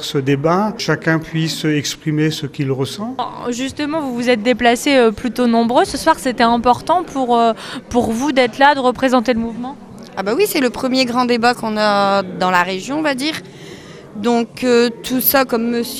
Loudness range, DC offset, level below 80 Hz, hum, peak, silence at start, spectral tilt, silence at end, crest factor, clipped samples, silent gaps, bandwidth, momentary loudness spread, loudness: 4 LU; under 0.1%; -48 dBFS; none; 0 dBFS; 0 s; -4.5 dB/octave; 0 s; 16 dB; under 0.1%; none; 15.5 kHz; 10 LU; -16 LUFS